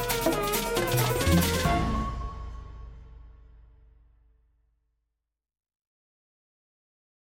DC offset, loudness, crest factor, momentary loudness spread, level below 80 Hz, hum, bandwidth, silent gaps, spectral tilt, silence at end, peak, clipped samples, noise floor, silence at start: under 0.1%; -26 LUFS; 20 dB; 21 LU; -40 dBFS; none; 17 kHz; none; -4.5 dB/octave; 3.85 s; -12 dBFS; under 0.1%; -85 dBFS; 0 s